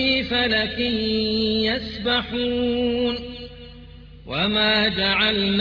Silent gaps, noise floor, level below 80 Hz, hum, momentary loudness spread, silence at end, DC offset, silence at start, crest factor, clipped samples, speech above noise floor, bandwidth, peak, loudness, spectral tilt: none; -42 dBFS; -42 dBFS; none; 9 LU; 0 s; under 0.1%; 0 s; 16 dB; under 0.1%; 20 dB; 5.4 kHz; -6 dBFS; -21 LUFS; -6.5 dB/octave